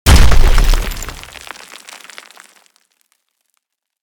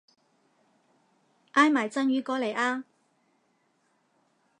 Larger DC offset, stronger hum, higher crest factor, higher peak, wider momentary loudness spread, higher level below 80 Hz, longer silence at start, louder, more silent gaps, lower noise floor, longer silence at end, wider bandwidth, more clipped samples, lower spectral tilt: neither; neither; second, 12 dB vs 24 dB; first, 0 dBFS vs -6 dBFS; first, 24 LU vs 7 LU; first, -14 dBFS vs -86 dBFS; second, 0.05 s vs 1.55 s; first, -15 LUFS vs -26 LUFS; neither; about the same, -70 dBFS vs -71 dBFS; first, 2.05 s vs 1.8 s; first, 19.5 kHz vs 10.5 kHz; first, 0.7% vs under 0.1%; about the same, -4 dB/octave vs -3.5 dB/octave